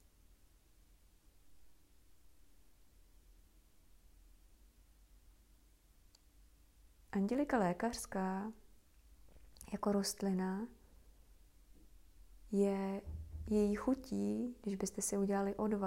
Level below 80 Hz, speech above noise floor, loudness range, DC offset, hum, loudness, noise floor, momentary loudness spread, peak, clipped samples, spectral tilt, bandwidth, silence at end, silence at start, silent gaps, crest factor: -62 dBFS; 31 dB; 4 LU; under 0.1%; none; -38 LUFS; -68 dBFS; 11 LU; -22 dBFS; under 0.1%; -5.5 dB/octave; 16 kHz; 0 s; 1.45 s; none; 20 dB